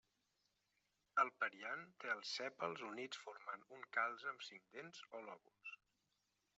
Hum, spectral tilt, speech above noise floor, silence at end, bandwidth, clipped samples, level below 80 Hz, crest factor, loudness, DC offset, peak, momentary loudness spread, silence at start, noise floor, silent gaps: none; 0 dB/octave; 38 dB; 0.8 s; 8 kHz; under 0.1%; under -90 dBFS; 26 dB; -46 LUFS; under 0.1%; -24 dBFS; 16 LU; 1.15 s; -86 dBFS; none